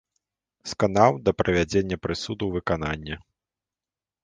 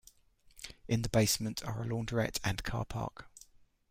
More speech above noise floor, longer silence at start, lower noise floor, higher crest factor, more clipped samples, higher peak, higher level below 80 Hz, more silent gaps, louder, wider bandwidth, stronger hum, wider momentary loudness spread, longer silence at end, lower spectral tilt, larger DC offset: first, over 66 dB vs 31 dB; about the same, 0.65 s vs 0.55 s; first, under -90 dBFS vs -64 dBFS; about the same, 22 dB vs 22 dB; neither; first, -4 dBFS vs -14 dBFS; first, -46 dBFS vs -52 dBFS; neither; first, -24 LUFS vs -34 LUFS; second, 9.8 kHz vs 16 kHz; neither; second, 16 LU vs 19 LU; first, 1.05 s vs 0.6 s; about the same, -5.5 dB/octave vs -4.5 dB/octave; neither